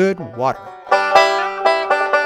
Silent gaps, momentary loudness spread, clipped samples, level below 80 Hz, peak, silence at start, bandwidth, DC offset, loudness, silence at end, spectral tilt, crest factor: none; 9 LU; under 0.1%; -58 dBFS; 0 dBFS; 0 s; 14.5 kHz; under 0.1%; -16 LUFS; 0 s; -4 dB/octave; 16 dB